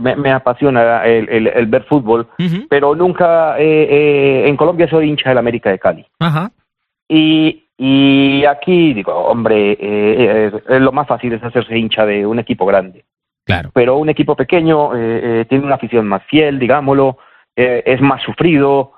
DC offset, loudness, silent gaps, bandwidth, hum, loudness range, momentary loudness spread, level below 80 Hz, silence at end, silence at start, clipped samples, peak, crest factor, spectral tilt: under 0.1%; -12 LUFS; 7.02-7.06 s; 4.7 kHz; none; 3 LU; 6 LU; -48 dBFS; 0.15 s; 0 s; under 0.1%; 0 dBFS; 12 dB; -9 dB/octave